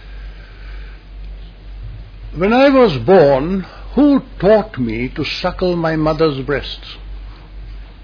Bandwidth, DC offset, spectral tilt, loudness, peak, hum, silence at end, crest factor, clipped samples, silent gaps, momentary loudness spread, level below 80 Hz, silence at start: 5.4 kHz; under 0.1%; -8 dB/octave; -14 LUFS; 0 dBFS; none; 0 s; 16 dB; under 0.1%; none; 25 LU; -32 dBFS; 0 s